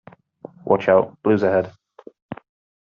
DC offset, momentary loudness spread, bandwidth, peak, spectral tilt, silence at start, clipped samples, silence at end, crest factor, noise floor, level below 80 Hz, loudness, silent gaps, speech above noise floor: under 0.1%; 22 LU; 6.6 kHz; -4 dBFS; -6 dB/octave; 0.65 s; under 0.1%; 0.55 s; 18 dB; -43 dBFS; -64 dBFS; -19 LUFS; 2.22-2.29 s; 26 dB